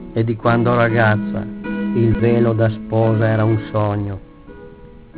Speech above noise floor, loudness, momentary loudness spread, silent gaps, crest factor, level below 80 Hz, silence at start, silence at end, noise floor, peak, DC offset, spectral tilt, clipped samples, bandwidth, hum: 23 dB; -17 LUFS; 10 LU; none; 14 dB; -40 dBFS; 0 s; 0 s; -39 dBFS; -2 dBFS; under 0.1%; -12 dB/octave; under 0.1%; 4 kHz; none